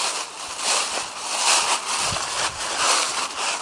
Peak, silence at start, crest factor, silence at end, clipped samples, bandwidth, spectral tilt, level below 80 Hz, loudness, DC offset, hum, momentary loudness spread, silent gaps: -6 dBFS; 0 s; 18 dB; 0 s; under 0.1%; 11.5 kHz; 0.5 dB/octave; -56 dBFS; -21 LUFS; under 0.1%; none; 8 LU; none